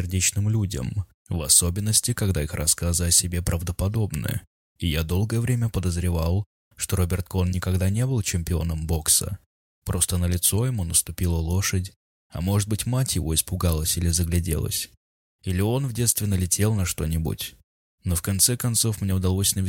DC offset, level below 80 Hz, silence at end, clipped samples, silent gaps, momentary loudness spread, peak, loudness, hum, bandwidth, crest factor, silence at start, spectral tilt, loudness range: under 0.1%; -36 dBFS; 0 s; under 0.1%; 1.14-1.25 s, 4.47-4.76 s, 6.46-6.71 s, 9.46-9.82 s, 11.96-12.30 s, 14.97-15.39 s, 17.64-17.98 s; 11 LU; -2 dBFS; -23 LUFS; none; 17 kHz; 20 dB; 0 s; -4 dB/octave; 4 LU